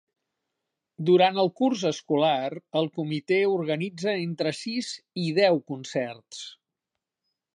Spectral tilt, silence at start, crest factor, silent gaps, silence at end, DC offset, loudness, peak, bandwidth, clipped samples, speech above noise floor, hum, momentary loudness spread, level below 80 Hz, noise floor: -5.5 dB/octave; 1 s; 20 dB; none; 1 s; under 0.1%; -26 LUFS; -8 dBFS; 10.5 kHz; under 0.1%; 61 dB; none; 11 LU; -78 dBFS; -86 dBFS